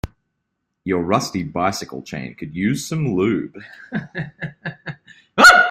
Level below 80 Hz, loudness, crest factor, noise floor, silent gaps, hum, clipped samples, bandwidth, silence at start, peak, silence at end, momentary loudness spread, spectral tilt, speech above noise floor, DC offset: -48 dBFS; -18 LUFS; 20 dB; -76 dBFS; none; none; under 0.1%; 16 kHz; 0.05 s; 0 dBFS; 0 s; 19 LU; -4 dB/octave; 57 dB; under 0.1%